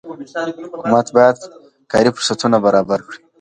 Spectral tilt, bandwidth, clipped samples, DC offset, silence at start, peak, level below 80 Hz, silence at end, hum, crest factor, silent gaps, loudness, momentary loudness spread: -4.5 dB/octave; 11 kHz; under 0.1%; under 0.1%; 0.05 s; 0 dBFS; -54 dBFS; 0.25 s; none; 16 dB; none; -16 LUFS; 13 LU